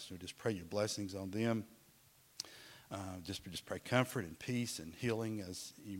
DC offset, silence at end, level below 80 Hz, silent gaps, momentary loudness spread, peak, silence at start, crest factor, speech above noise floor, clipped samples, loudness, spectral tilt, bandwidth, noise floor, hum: under 0.1%; 0 s; -74 dBFS; none; 12 LU; -16 dBFS; 0 s; 26 dB; 27 dB; under 0.1%; -41 LUFS; -5 dB/octave; 16.5 kHz; -67 dBFS; none